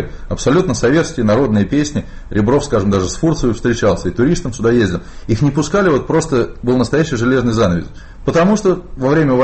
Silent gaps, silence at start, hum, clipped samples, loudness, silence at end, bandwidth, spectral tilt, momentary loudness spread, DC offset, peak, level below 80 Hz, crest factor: none; 0 s; none; under 0.1%; -15 LUFS; 0 s; 8.8 kHz; -6 dB/octave; 6 LU; under 0.1%; -2 dBFS; -30 dBFS; 12 dB